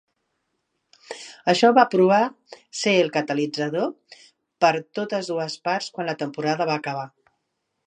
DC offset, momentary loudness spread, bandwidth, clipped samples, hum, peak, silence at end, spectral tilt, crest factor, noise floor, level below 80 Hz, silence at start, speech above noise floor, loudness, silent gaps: under 0.1%; 15 LU; 10 kHz; under 0.1%; none; -2 dBFS; 0.8 s; -4.5 dB/octave; 22 dB; -77 dBFS; -78 dBFS; 1.1 s; 55 dB; -22 LUFS; none